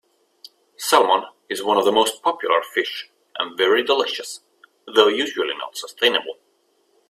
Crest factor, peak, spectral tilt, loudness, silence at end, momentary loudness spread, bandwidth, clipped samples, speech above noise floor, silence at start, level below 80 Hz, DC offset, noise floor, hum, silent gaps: 22 dB; 0 dBFS; -1.5 dB/octave; -20 LUFS; 0.75 s; 15 LU; 16 kHz; under 0.1%; 44 dB; 0.8 s; -68 dBFS; under 0.1%; -64 dBFS; none; none